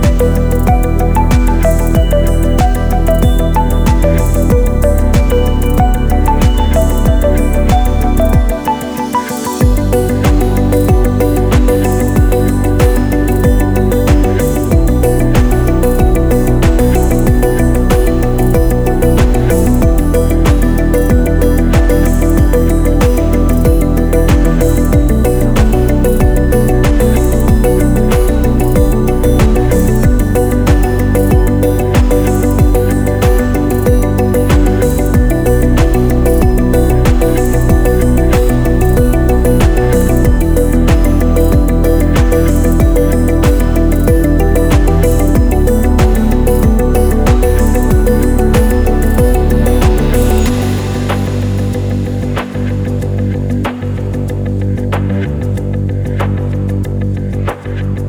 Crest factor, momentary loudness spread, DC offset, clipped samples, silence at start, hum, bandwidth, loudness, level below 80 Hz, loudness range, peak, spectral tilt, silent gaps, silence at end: 10 dB; 5 LU; under 0.1%; under 0.1%; 0 s; none; over 20 kHz; -12 LUFS; -12 dBFS; 3 LU; 0 dBFS; -7 dB/octave; none; 0 s